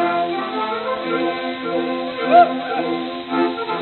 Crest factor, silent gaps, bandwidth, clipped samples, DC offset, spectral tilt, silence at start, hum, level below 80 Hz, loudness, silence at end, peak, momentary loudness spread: 18 dB; none; 4.4 kHz; under 0.1%; under 0.1%; -7.5 dB/octave; 0 s; none; -62 dBFS; -20 LUFS; 0 s; -2 dBFS; 10 LU